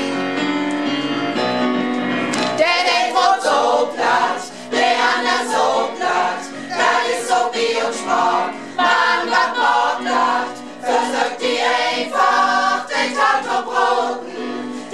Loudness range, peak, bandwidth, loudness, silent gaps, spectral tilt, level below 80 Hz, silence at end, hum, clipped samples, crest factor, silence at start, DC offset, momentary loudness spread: 2 LU; -2 dBFS; 13 kHz; -18 LUFS; none; -2.5 dB/octave; -68 dBFS; 0 s; none; under 0.1%; 16 dB; 0 s; 0.4%; 7 LU